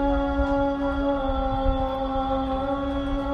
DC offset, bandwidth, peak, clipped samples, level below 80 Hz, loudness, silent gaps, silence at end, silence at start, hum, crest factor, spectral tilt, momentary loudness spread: under 0.1%; 6.6 kHz; -10 dBFS; under 0.1%; -30 dBFS; -25 LUFS; none; 0 s; 0 s; none; 14 dB; -8.5 dB/octave; 3 LU